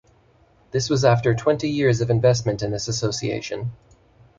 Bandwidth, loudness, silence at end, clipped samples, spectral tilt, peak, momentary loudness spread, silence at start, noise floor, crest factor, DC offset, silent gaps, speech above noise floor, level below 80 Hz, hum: 7.6 kHz; -21 LUFS; 0.65 s; under 0.1%; -5.5 dB/octave; -4 dBFS; 10 LU; 0.75 s; -57 dBFS; 18 dB; under 0.1%; none; 36 dB; -48 dBFS; none